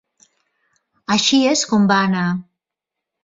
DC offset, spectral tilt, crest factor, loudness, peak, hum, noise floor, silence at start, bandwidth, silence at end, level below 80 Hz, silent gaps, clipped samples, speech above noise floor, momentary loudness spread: under 0.1%; -4 dB/octave; 16 dB; -16 LUFS; -4 dBFS; none; -84 dBFS; 1.1 s; 7.8 kHz; 0.8 s; -60 dBFS; none; under 0.1%; 68 dB; 11 LU